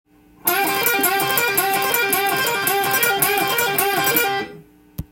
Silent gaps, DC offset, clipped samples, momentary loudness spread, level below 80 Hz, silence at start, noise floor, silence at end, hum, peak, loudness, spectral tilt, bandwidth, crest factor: none; under 0.1%; under 0.1%; 6 LU; -50 dBFS; 0.45 s; -43 dBFS; 0.05 s; none; -2 dBFS; -17 LUFS; -1.5 dB/octave; 17 kHz; 18 dB